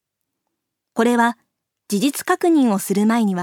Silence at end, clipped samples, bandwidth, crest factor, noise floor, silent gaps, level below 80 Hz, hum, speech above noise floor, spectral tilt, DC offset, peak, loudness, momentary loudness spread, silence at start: 0 s; under 0.1%; 18.5 kHz; 16 dB; -78 dBFS; none; -74 dBFS; none; 61 dB; -5 dB/octave; under 0.1%; -4 dBFS; -18 LUFS; 9 LU; 0.95 s